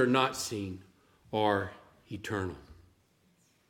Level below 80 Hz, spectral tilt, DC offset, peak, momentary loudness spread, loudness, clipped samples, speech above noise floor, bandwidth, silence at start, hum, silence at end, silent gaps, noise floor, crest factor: -64 dBFS; -4.5 dB/octave; under 0.1%; -12 dBFS; 17 LU; -33 LUFS; under 0.1%; 37 dB; 17 kHz; 0 s; none; 0.95 s; none; -69 dBFS; 22 dB